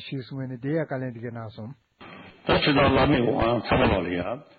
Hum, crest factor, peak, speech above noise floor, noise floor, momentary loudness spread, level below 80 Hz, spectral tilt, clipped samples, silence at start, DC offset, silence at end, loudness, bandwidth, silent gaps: none; 16 dB; -10 dBFS; 22 dB; -46 dBFS; 20 LU; -42 dBFS; -9.5 dB/octave; under 0.1%; 0 s; under 0.1%; 0.15 s; -24 LUFS; 5 kHz; none